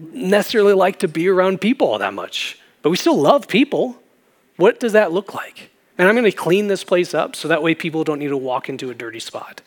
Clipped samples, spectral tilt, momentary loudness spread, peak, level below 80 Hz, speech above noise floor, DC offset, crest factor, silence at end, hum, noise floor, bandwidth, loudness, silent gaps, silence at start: under 0.1%; -5 dB/octave; 14 LU; 0 dBFS; -78 dBFS; 40 dB; under 0.1%; 18 dB; 0.15 s; none; -58 dBFS; over 20 kHz; -17 LUFS; none; 0 s